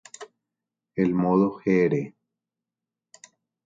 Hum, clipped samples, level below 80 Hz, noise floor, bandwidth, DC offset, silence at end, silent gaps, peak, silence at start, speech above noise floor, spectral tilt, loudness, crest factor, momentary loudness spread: none; under 0.1%; -64 dBFS; -88 dBFS; 7.8 kHz; under 0.1%; 1.55 s; none; -8 dBFS; 0.2 s; 66 dB; -8 dB/octave; -23 LUFS; 18 dB; 19 LU